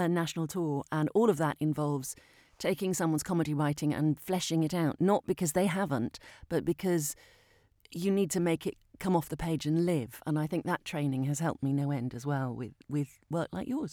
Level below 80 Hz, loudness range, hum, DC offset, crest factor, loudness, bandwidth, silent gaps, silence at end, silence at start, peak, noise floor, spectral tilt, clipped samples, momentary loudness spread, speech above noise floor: -60 dBFS; 3 LU; none; under 0.1%; 18 dB; -32 LUFS; 19.5 kHz; none; 0 s; 0 s; -12 dBFS; -64 dBFS; -6 dB/octave; under 0.1%; 7 LU; 33 dB